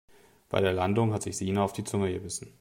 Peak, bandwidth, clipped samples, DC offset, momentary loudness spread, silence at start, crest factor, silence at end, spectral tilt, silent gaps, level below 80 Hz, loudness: -10 dBFS; 16 kHz; under 0.1%; under 0.1%; 6 LU; 0.5 s; 20 dB; 0.1 s; -5.5 dB/octave; none; -62 dBFS; -29 LUFS